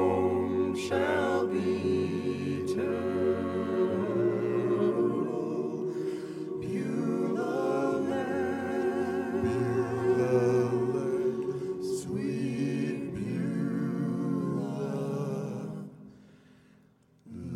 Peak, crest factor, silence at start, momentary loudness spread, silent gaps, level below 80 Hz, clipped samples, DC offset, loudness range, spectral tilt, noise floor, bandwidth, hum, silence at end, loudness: -14 dBFS; 16 dB; 0 s; 7 LU; none; -64 dBFS; under 0.1%; under 0.1%; 4 LU; -7.5 dB/octave; -62 dBFS; 12.5 kHz; none; 0 s; -30 LUFS